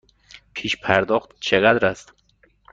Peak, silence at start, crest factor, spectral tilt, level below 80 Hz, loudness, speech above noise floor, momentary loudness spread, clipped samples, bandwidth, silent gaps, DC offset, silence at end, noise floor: -2 dBFS; 0.55 s; 20 dB; -4.5 dB/octave; -54 dBFS; -20 LUFS; 40 dB; 15 LU; under 0.1%; 8.8 kHz; none; under 0.1%; 0.7 s; -60 dBFS